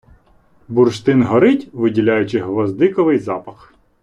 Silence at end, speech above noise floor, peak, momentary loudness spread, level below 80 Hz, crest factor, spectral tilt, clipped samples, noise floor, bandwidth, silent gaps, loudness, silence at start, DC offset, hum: 0.5 s; 37 dB; -2 dBFS; 7 LU; -54 dBFS; 14 dB; -7.5 dB/octave; under 0.1%; -52 dBFS; 10 kHz; none; -16 LUFS; 0.7 s; under 0.1%; none